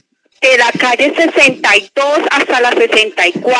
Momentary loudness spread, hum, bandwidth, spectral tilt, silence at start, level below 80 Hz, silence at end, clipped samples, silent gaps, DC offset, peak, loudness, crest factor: 4 LU; none; 11 kHz; -2 dB/octave; 0.4 s; -56 dBFS; 0 s; under 0.1%; none; under 0.1%; 0 dBFS; -10 LUFS; 12 dB